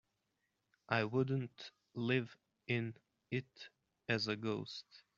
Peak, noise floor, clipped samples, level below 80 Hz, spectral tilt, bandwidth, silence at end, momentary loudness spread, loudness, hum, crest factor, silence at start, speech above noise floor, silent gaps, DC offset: -16 dBFS; -85 dBFS; under 0.1%; -80 dBFS; -4.5 dB/octave; 7.4 kHz; 0.2 s; 18 LU; -39 LUFS; none; 24 dB; 0.9 s; 46 dB; none; under 0.1%